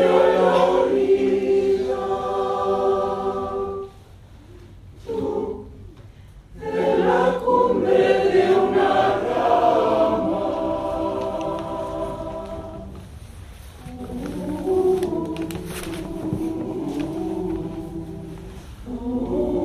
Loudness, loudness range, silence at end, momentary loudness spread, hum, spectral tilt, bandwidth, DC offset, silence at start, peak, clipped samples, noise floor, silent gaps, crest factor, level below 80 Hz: -21 LUFS; 11 LU; 0 s; 19 LU; none; -6.5 dB/octave; 14 kHz; under 0.1%; 0 s; -4 dBFS; under 0.1%; -44 dBFS; none; 18 dB; -44 dBFS